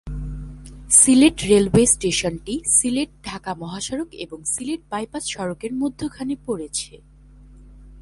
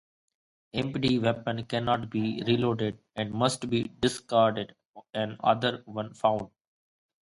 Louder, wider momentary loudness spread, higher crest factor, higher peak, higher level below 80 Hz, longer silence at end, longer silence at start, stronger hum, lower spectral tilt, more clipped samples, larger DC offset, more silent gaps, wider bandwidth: first, -19 LUFS vs -29 LUFS; first, 18 LU vs 10 LU; about the same, 22 dB vs 20 dB; first, 0 dBFS vs -8 dBFS; first, -40 dBFS vs -60 dBFS; second, 0 s vs 0.95 s; second, 0.05 s vs 0.75 s; neither; second, -3.5 dB/octave vs -5.5 dB/octave; neither; neither; second, none vs 4.85-4.94 s; about the same, 11.5 kHz vs 11.5 kHz